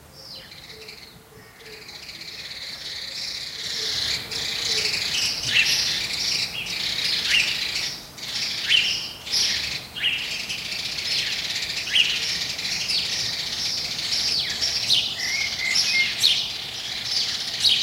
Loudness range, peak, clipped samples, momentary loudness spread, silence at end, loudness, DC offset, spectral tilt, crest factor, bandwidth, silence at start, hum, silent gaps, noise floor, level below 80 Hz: 7 LU; -4 dBFS; under 0.1%; 16 LU; 0 s; -22 LUFS; under 0.1%; 0.5 dB/octave; 22 dB; 16 kHz; 0 s; none; none; -47 dBFS; -54 dBFS